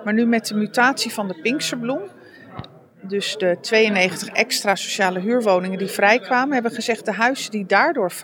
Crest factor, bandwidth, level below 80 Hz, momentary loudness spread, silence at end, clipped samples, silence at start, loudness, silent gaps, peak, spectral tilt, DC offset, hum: 18 dB; over 20 kHz; -68 dBFS; 9 LU; 0 s; under 0.1%; 0 s; -20 LUFS; none; -2 dBFS; -3.5 dB/octave; under 0.1%; none